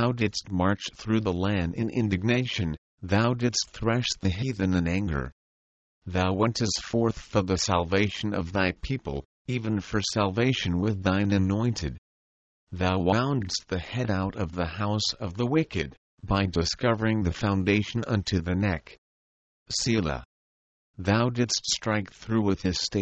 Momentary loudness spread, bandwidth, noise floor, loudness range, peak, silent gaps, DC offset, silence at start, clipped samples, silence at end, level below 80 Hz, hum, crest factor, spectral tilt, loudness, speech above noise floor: 8 LU; 8.6 kHz; under -90 dBFS; 2 LU; -8 dBFS; 2.78-2.98 s, 5.32-6.02 s, 9.25-9.45 s, 11.98-12.67 s, 15.97-16.18 s, 18.98-19.66 s, 20.25-20.94 s; under 0.1%; 0 s; under 0.1%; 0 s; -46 dBFS; none; 18 dB; -5 dB/octave; -27 LUFS; over 64 dB